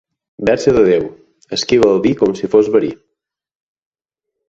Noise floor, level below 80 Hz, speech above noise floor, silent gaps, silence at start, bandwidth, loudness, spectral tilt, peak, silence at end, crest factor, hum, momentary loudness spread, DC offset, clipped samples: -81 dBFS; -46 dBFS; 68 dB; none; 0.4 s; 7.8 kHz; -14 LUFS; -5.5 dB/octave; 0 dBFS; 1.55 s; 16 dB; none; 10 LU; under 0.1%; under 0.1%